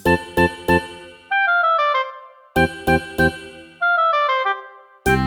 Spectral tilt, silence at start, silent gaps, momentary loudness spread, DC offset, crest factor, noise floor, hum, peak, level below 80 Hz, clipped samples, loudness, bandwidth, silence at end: -5.5 dB/octave; 0.05 s; none; 13 LU; under 0.1%; 18 dB; -39 dBFS; none; -2 dBFS; -38 dBFS; under 0.1%; -19 LUFS; over 20 kHz; 0 s